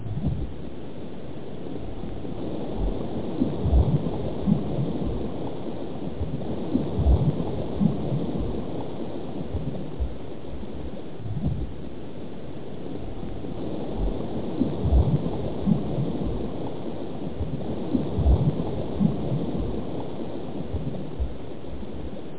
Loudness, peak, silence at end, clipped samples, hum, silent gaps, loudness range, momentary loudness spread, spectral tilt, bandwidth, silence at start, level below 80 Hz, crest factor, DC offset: -29 LUFS; -10 dBFS; 0 s; under 0.1%; none; none; 7 LU; 14 LU; -12.5 dB/octave; 4 kHz; 0 s; -32 dBFS; 18 dB; 3%